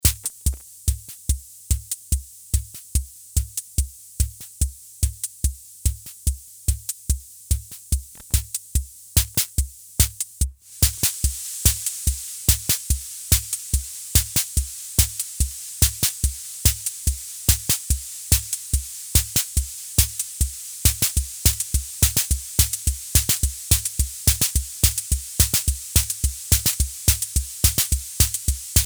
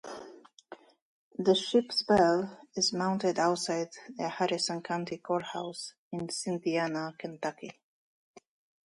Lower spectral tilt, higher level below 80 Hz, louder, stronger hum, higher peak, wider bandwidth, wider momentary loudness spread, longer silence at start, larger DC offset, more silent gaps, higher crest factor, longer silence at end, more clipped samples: second, -2 dB/octave vs -4 dB/octave; first, -28 dBFS vs -68 dBFS; first, -22 LUFS vs -31 LUFS; neither; first, 0 dBFS vs -12 dBFS; first, over 20 kHz vs 11.5 kHz; second, 9 LU vs 14 LU; about the same, 0.05 s vs 0.05 s; neither; second, none vs 1.02-1.31 s, 5.98-6.11 s; about the same, 22 dB vs 20 dB; second, 0 s vs 1.15 s; neither